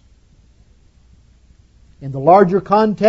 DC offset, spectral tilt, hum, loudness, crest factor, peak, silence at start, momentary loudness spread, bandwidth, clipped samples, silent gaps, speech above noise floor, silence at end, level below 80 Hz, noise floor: under 0.1%; -8.5 dB/octave; none; -13 LUFS; 18 dB; 0 dBFS; 2 s; 19 LU; 7.6 kHz; under 0.1%; none; 38 dB; 0 s; -50 dBFS; -50 dBFS